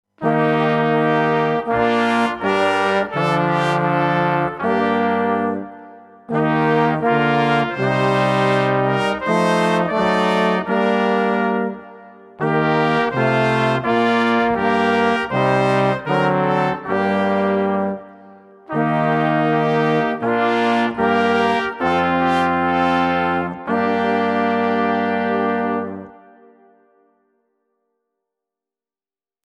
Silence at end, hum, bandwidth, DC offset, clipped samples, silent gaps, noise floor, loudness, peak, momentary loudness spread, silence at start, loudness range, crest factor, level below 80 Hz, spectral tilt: 3.35 s; none; 12 kHz; under 0.1%; under 0.1%; none; under -90 dBFS; -18 LUFS; -2 dBFS; 4 LU; 0.2 s; 3 LU; 16 dB; -54 dBFS; -6.5 dB/octave